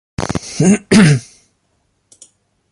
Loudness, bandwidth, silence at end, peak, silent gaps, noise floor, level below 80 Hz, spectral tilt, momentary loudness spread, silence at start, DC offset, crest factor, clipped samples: -13 LUFS; 11.5 kHz; 1.5 s; 0 dBFS; none; -63 dBFS; -42 dBFS; -5.5 dB/octave; 12 LU; 0.2 s; under 0.1%; 16 dB; under 0.1%